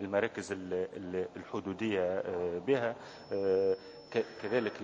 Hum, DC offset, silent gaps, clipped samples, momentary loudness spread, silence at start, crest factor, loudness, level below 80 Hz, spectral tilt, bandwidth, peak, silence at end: none; under 0.1%; none; under 0.1%; 8 LU; 0 s; 18 dB; -35 LUFS; -66 dBFS; -6 dB/octave; 8 kHz; -16 dBFS; 0 s